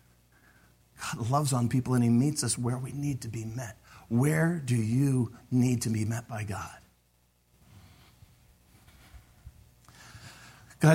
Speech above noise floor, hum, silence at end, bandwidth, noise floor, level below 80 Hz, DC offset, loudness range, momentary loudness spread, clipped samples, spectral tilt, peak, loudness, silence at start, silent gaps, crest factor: 40 dB; 60 Hz at -50 dBFS; 0 s; 16.5 kHz; -68 dBFS; -60 dBFS; under 0.1%; 10 LU; 18 LU; under 0.1%; -6 dB/octave; -10 dBFS; -29 LUFS; 1 s; none; 20 dB